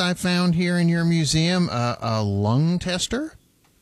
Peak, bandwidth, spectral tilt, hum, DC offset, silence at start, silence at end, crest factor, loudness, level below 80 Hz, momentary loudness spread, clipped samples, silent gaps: -8 dBFS; 12.5 kHz; -5.5 dB/octave; none; under 0.1%; 0 s; 0.5 s; 14 dB; -21 LUFS; -48 dBFS; 5 LU; under 0.1%; none